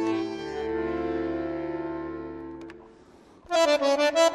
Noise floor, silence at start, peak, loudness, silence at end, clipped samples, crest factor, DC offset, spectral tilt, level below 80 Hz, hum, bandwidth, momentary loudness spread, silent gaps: -53 dBFS; 0 s; -10 dBFS; -27 LUFS; 0 s; under 0.1%; 16 dB; under 0.1%; -3.5 dB/octave; -54 dBFS; none; 13.5 kHz; 17 LU; none